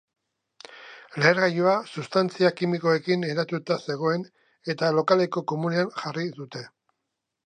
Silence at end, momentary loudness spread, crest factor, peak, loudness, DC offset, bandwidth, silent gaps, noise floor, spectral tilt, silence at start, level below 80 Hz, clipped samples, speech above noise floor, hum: 0.8 s; 17 LU; 22 dB; -4 dBFS; -25 LUFS; under 0.1%; 9.6 kHz; none; -82 dBFS; -6 dB/octave; 0.7 s; -76 dBFS; under 0.1%; 58 dB; none